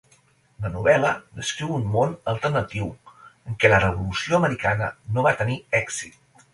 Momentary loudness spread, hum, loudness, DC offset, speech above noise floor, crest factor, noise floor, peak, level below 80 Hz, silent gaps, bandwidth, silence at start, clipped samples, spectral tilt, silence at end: 13 LU; none; -23 LUFS; under 0.1%; 37 dB; 22 dB; -60 dBFS; -2 dBFS; -46 dBFS; none; 11.5 kHz; 0.6 s; under 0.1%; -5 dB/octave; 0.45 s